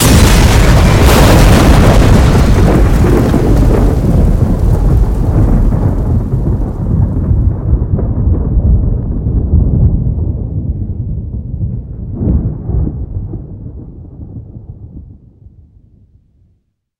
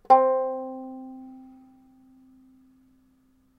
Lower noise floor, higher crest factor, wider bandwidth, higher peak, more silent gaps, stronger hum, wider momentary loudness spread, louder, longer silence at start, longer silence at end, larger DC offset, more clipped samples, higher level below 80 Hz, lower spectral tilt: second, -58 dBFS vs -63 dBFS; second, 10 dB vs 24 dB; first, 17.5 kHz vs 6 kHz; first, 0 dBFS vs -4 dBFS; neither; neither; second, 18 LU vs 27 LU; first, -11 LUFS vs -24 LUFS; about the same, 0 s vs 0.1 s; second, 1.9 s vs 2.2 s; neither; first, 2% vs under 0.1%; first, -14 dBFS vs -72 dBFS; about the same, -6.5 dB/octave vs -6 dB/octave